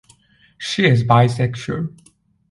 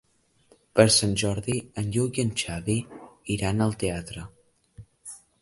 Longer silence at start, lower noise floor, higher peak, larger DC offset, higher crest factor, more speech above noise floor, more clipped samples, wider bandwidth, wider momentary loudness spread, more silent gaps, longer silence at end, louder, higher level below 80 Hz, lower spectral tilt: second, 0.6 s vs 0.75 s; second, -54 dBFS vs -62 dBFS; first, 0 dBFS vs -4 dBFS; neither; second, 18 dB vs 24 dB; about the same, 37 dB vs 37 dB; neither; about the same, 11.5 kHz vs 11.5 kHz; second, 14 LU vs 24 LU; neither; first, 0.65 s vs 0.25 s; first, -17 LUFS vs -25 LUFS; about the same, -50 dBFS vs -48 dBFS; first, -6.5 dB/octave vs -4.5 dB/octave